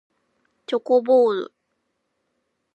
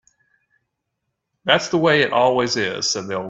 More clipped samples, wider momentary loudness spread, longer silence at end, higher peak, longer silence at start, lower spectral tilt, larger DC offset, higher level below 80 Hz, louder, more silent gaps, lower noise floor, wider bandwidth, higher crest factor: neither; first, 12 LU vs 6 LU; first, 1.3 s vs 0 s; second, -6 dBFS vs -2 dBFS; second, 0.7 s vs 1.45 s; first, -6 dB/octave vs -3.5 dB/octave; neither; second, -86 dBFS vs -60 dBFS; about the same, -20 LUFS vs -18 LUFS; neither; about the same, -74 dBFS vs -77 dBFS; about the same, 8 kHz vs 8 kHz; about the same, 16 dB vs 20 dB